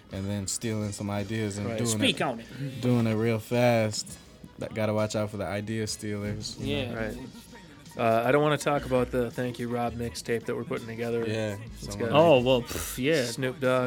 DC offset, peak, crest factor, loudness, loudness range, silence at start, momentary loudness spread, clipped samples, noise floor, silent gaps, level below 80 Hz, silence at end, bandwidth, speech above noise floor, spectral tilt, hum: under 0.1%; -6 dBFS; 22 dB; -28 LUFS; 5 LU; 0.1 s; 13 LU; under 0.1%; -48 dBFS; none; -52 dBFS; 0 s; 19 kHz; 20 dB; -5 dB/octave; none